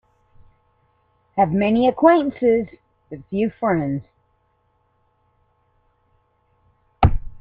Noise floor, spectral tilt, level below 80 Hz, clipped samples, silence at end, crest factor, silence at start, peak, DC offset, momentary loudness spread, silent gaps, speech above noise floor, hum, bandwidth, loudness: -65 dBFS; -10.5 dB/octave; -36 dBFS; under 0.1%; 0 s; 20 dB; 1.35 s; -2 dBFS; under 0.1%; 15 LU; none; 47 dB; none; 5 kHz; -19 LUFS